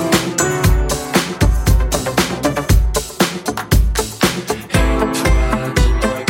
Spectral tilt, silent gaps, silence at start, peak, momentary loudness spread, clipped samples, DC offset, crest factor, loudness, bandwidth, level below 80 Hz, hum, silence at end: -4.5 dB/octave; none; 0 s; 0 dBFS; 3 LU; under 0.1%; under 0.1%; 14 dB; -16 LUFS; 17 kHz; -18 dBFS; none; 0 s